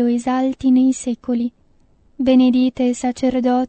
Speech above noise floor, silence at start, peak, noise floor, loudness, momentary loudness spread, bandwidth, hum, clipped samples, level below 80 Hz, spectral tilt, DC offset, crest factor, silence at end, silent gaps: 38 dB; 0 s; -4 dBFS; -54 dBFS; -18 LUFS; 8 LU; 8.8 kHz; none; under 0.1%; -50 dBFS; -5 dB/octave; under 0.1%; 14 dB; 0 s; none